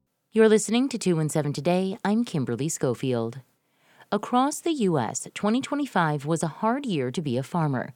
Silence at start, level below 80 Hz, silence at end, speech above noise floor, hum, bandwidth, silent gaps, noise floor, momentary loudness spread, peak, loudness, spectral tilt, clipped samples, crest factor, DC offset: 0.35 s; -68 dBFS; 0.05 s; 38 dB; none; 16.5 kHz; none; -63 dBFS; 7 LU; -8 dBFS; -25 LUFS; -5.5 dB/octave; under 0.1%; 18 dB; under 0.1%